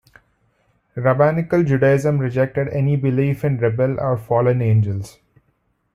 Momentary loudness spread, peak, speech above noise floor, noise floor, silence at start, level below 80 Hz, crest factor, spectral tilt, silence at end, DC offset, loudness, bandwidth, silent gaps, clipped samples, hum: 6 LU; -4 dBFS; 48 dB; -66 dBFS; 0.95 s; -50 dBFS; 16 dB; -9 dB/octave; 0.85 s; under 0.1%; -18 LUFS; 12.5 kHz; none; under 0.1%; none